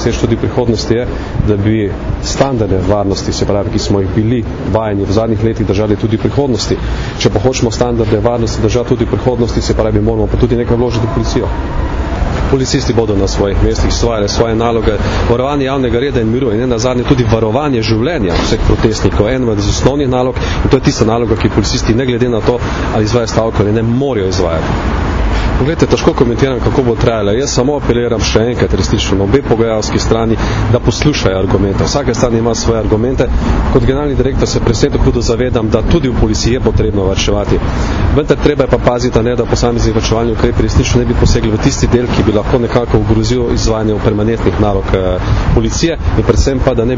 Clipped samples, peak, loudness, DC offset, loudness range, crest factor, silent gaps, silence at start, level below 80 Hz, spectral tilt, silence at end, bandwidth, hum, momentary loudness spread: 0.2%; 0 dBFS; -12 LUFS; under 0.1%; 2 LU; 12 dB; none; 0 s; -20 dBFS; -6 dB/octave; 0 s; 7.6 kHz; none; 3 LU